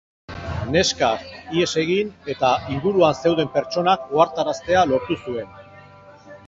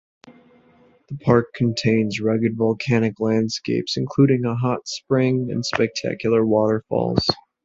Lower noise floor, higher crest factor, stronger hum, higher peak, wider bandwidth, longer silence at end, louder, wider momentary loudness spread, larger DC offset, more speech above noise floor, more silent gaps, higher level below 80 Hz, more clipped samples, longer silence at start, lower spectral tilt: second, -45 dBFS vs -55 dBFS; about the same, 18 dB vs 20 dB; neither; about the same, -2 dBFS vs 0 dBFS; about the same, 8 kHz vs 7.8 kHz; second, 0.1 s vs 0.25 s; about the same, -21 LUFS vs -21 LUFS; first, 12 LU vs 6 LU; neither; second, 25 dB vs 35 dB; neither; about the same, -46 dBFS vs -50 dBFS; neither; about the same, 0.3 s vs 0.25 s; second, -4.5 dB/octave vs -6 dB/octave